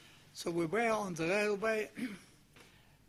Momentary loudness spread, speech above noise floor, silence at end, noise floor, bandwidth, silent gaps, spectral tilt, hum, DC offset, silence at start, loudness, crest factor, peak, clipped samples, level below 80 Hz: 12 LU; 27 dB; 0.45 s; -62 dBFS; 15.5 kHz; none; -4.5 dB/octave; none; under 0.1%; 0.05 s; -35 LUFS; 18 dB; -20 dBFS; under 0.1%; -70 dBFS